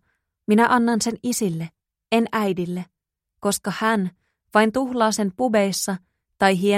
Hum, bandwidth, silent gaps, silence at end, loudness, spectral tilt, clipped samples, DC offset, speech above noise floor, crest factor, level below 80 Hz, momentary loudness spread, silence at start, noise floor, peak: none; 16 kHz; none; 0 s; -22 LUFS; -4.5 dB/octave; under 0.1%; under 0.1%; 58 dB; 18 dB; -60 dBFS; 13 LU; 0.5 s; -79 dBFS; -4 dBFS